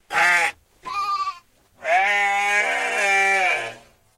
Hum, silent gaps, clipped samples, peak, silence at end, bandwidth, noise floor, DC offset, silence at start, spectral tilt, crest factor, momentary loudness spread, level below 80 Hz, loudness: none; none; under 0.1%; -6 dBFS; 0.4 s; 15.5 kHz; -49 dBFS; under 0.1%; 0.1 s; 0 dB/octave; 16 dB; 13 LU; -62 dBFS; -19 LUFS